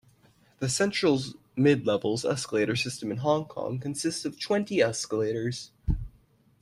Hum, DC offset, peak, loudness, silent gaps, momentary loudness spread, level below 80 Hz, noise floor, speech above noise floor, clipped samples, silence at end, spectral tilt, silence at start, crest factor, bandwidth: none; under 0.1%; -10 dBFS; -28 LUFS; none; 10 LU; -44 dBFS; -62 dBFS; 35 dB; under 0.1%; 0.55 s; -5 dB/octave; 0.6 s; 18 dB; 13 kHz